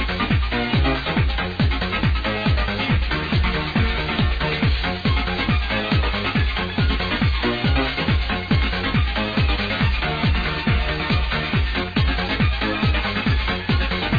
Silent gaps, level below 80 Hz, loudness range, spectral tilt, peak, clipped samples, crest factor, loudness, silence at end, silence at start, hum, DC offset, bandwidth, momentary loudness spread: none; -26 dBFS; 0 LU; -7.5 dB/octave; -6 dBFS; under 0.1%; 14 dB; -21 LUFS; 0 s; 0 s; none; under 0.1%; 5 kHz; 1 LU